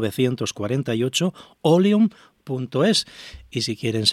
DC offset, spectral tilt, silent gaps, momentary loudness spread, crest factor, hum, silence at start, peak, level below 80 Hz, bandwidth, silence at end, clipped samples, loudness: under 0.1%; -5 dB/octave; none; 13 LU; 18 dB; none; 0 s; -4 dBFS; -56 dBFS; 15 kHz; 0 s; under 0.1%; -22 LUFS